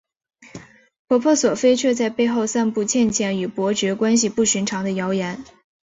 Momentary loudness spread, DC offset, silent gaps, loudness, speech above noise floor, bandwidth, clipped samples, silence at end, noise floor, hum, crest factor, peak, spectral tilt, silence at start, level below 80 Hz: 6 LU; under 0.1%; 0.99-1.08 s; -20 LUFS; 23 dB; 8 kHz; under 0.1%; 0.4 s; -42 dBFS; none; 14 dB; -6 dBFS; -4 dB/octave; 0.45 s; -58 dBFS